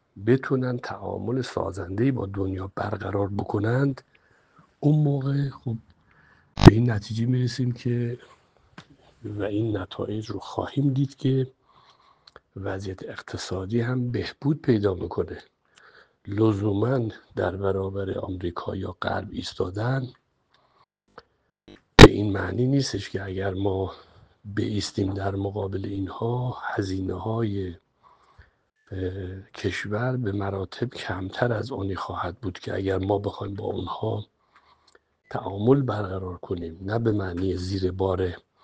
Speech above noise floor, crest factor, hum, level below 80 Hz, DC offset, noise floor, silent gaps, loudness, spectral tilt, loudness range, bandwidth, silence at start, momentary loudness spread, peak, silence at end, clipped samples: 40 dB; 26 dB; none; -40 dBFS; under 0.1%; -66 dBFS; none; -25 LUFS; -6.5 dB/octave; 11 LU; 9.8 kHz; 0.15 s; 11 LU; 0 dBFS; 0.25 s; under 0.1%